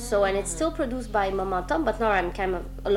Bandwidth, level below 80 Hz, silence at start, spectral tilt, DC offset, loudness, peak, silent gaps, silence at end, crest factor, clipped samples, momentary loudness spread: 16 kHz; -38 dBFS; 0 s; -4.5 dB/octave; under 0.1%; -26 LUFS; -10 dBFS; none; 0 s; 16 dB; under 0.1%; 6 LU